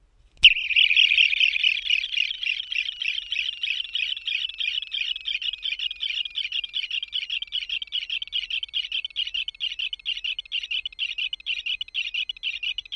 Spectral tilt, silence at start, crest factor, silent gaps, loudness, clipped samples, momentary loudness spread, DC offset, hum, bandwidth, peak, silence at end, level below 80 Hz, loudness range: 2.5 dB/octave; 0.4 s; 24 dB; none; -23 LUFS; under 0.1%; 12 LU; under 0.1%; none; 11 kHz; -2 dBFS; 0 s; -58 dBFS; 7 LU